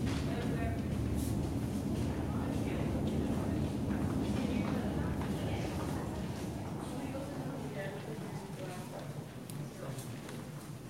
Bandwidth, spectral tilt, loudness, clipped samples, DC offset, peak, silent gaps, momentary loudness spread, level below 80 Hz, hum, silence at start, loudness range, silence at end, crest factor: 16 kHz; -6.5 dB/octave; -37 LUFS; under 0.1%; under 0.1%; -22 dBFS; none; 9 LU; -46 dBFS; none; 0 s; 7 LU; 0 s; 14 dB